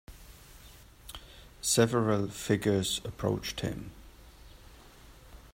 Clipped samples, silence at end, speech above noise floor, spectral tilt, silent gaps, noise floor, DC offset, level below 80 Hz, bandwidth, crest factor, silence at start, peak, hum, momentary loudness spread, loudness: under 0.1%; 0.05 s; 24 dB; -4.5 dB/octave; none; -53 dBFS; under 0.1%; -54 dBFS; 16 kHz; 24 dB; 0.1 s; -10 dBFS; none; 26 LU; -30 LUFS